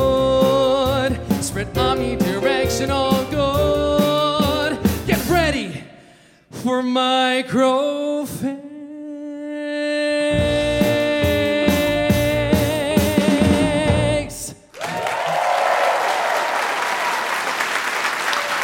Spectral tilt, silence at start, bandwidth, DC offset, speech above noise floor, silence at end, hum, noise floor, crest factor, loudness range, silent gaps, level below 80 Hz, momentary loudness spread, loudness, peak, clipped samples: -5 dB/octave; 0 s; 17 kHz; under 0.1%; 31 dB; 0 s; none; -49 dBFS; 16 dB; 3 LU; none; -36 dBFS; 10 LU; -19 LUFS; -2 dBFS; under 0.1%